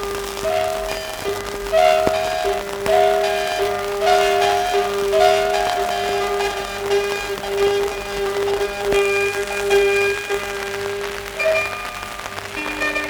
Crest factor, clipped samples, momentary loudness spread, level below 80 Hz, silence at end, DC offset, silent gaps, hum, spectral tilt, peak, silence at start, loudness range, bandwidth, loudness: 18 dB; under 0.1%; 10 LU; -42 dBFS; 0 s; under 0.1%; none; 50 Hz at -50 dBFS; -2.5 dB/octave; -2 dBFS; 0 s; 3 LU; over 20 kHz; -20 LUFS